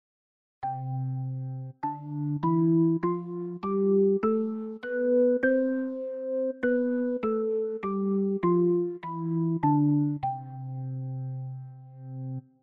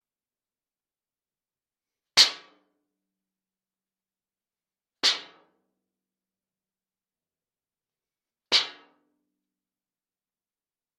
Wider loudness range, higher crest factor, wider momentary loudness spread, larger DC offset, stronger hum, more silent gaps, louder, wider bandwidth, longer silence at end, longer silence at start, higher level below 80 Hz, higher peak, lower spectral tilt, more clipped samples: about the same, 3 LU vs 5 LU; second, 14 dB vs 32 dB; about the same, 14 LU vs 15 LU; neither; neither; neither; second, -28 LUFS vs -22 LUFS; second, 4.4 kHz vs 10 kHz; second, 0.25 s vs 2.25 s; second, 0.6 s vs 2.15 s; first, -68 dBFS vs -74 dBFS; second, -14 dBFS vs -2 dBFS; first, -12 dB/octave vs 2 dB/octave; neither